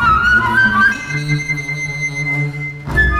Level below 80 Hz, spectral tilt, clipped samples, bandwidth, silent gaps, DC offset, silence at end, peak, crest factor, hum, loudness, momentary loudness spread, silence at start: -28 dBFS; -4.5 dB/octave; under 0.1%; 15 kHz; none; under 0.1%; 0 s; -2 dBFS; 12 dB; none; -15 LUFS; 9 LU; 0 s